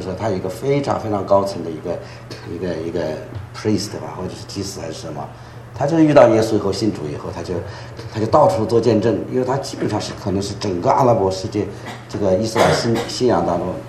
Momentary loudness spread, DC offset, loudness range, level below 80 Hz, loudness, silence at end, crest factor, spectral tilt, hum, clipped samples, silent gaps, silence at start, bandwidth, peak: 15 LU; under 0.1%; 9 LU; -48 dBFS; -19 LUFS; 0 s; 18 dB; -6 dB/octave; none; under 0.1%; none; 0 s; 13.5 kHz; 0 dBFS